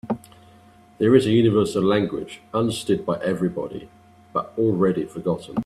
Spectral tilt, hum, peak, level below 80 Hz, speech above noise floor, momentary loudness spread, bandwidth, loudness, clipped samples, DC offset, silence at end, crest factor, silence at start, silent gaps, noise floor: -7 dB/octave; none; -2 dBFS; -56 dBFS; 30 dB; 13 LU; 13 kHz; -22 LUFS; under 0.1%; under 0.1%; 0 s; 20 dB; 0.05 s; none; -51 dBFS